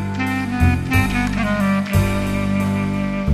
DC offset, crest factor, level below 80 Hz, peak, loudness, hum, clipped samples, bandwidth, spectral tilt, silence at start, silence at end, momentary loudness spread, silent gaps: under 0.1%; 14 dB; -30 dBFS; -4 dBFS; -19 LUFS; 50 Hz at -35 dBFS; under 0.1%; 14 kHz; -6.5 dB/octave; 0 s; 0 s; 4 LU; none